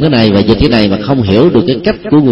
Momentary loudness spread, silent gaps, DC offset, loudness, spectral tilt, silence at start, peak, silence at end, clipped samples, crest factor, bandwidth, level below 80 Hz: 4 LU; none; under 0.1%; -9 LUFS; -8.5 dB/octave; 0 s; 0 dBFS; 0 s; 0.5%; 8 dB; 6.2 kHz; -28 dBFS